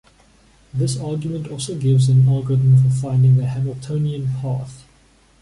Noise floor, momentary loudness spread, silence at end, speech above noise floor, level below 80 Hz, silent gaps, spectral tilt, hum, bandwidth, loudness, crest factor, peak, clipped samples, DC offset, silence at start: -53 dBFS; 12 LU; 0.6 s; 36 dB; -48 dBFS; none; -7.5 dB/octave; none; 11.5 kHz; -18 LUFS; 12 dB; -6 dBFS; under 0.1%; under 0.1%; 0.75 s